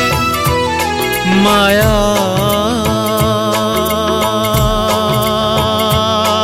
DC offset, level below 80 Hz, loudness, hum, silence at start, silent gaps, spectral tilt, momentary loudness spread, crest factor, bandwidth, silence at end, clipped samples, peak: under 0.1%; -28 dBFS; -13 LUFS; none; 0 s; none; -4.5 dB/octave; 4 LU; 12 dB; 17 kHz; 0 s; under 0.1%; 0 dBFS